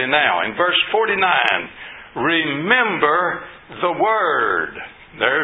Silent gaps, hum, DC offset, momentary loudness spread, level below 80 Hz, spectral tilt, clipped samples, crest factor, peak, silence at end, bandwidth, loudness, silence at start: none; none; under 0.1%; 16 LU; -56 dBFS; -6 dB/octave; under 0.1%; 18 dB; 0 dBFS; 0 s; 8 kHz; -17 LUFS; 0 s